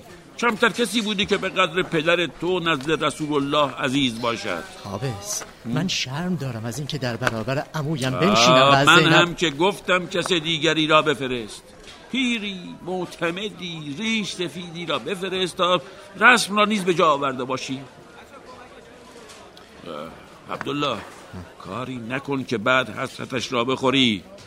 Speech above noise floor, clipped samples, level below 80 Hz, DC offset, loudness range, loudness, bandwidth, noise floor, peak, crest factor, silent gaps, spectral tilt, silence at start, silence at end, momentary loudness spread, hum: 22 dB; under 0.1%; -54 dBFS; under 0.1%; 13 LU; -21 LUFS; 16 kHz; -44 dBFS; 0 dBFS; 22 dB; none; -4 dB/octave; 0 s; 0 s; 16 LU; none